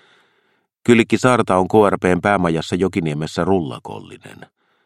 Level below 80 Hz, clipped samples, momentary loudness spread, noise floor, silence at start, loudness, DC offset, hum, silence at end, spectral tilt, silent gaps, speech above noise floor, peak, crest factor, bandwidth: -50 dBFS; under 0.1%; 12 LU; -64 dBFS; 0.85 s; -17 LUFS; under 0.1%; none; 0.55 s; -6 dB/octave; none; 47 dB; 0 dBFS; 18 dB; 13.5 kHz